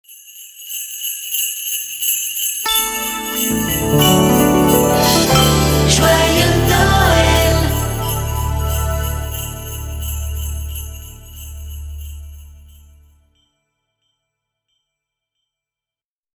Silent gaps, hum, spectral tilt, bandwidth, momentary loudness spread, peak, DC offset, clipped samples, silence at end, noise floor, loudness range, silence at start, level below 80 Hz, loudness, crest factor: none; none; -4 dB/octave; over 20 kHz; 20 LU; 0 dBFS; under 0.1%; under 0.1%; 3.8 s; under -90 dBFS; 18 LU; 0.1 s; -26 dBFS; -15 LUFS; 18 dB